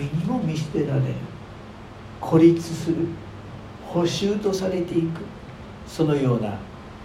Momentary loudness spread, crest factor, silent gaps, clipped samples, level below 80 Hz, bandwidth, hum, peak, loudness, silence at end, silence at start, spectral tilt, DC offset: 21 LU; 20 dB; none; under 0.1%; -48 dBFS; 14 kHz; none; -4 dBFS; -23 LUFS; 0 s; 0 s; -7 dB/octave; under 0.1%